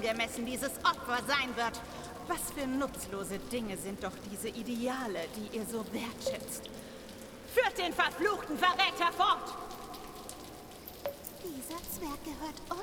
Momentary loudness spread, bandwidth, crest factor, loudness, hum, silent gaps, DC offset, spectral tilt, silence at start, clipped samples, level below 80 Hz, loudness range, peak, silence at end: 16 LU; over 20 kHz; 22 dB; -34 LUFS; none; none; under 0.1%; -3 dB/octave; 0 s; under 0.1%; -58 dBFS; 7 LU; -12 dBFS; 0 s